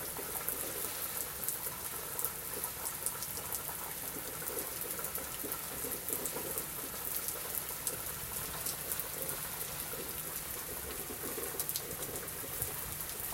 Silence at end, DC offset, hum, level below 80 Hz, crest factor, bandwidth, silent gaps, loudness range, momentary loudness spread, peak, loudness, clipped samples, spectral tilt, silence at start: 0 s; under 0.1%; none; -58 dBFS; 30 dB; 17 kHz; none; 1 LU; 3 LU; -10 dBFS; -37 LUFS; under 0.1%; -1.5 dB/octave; 0 s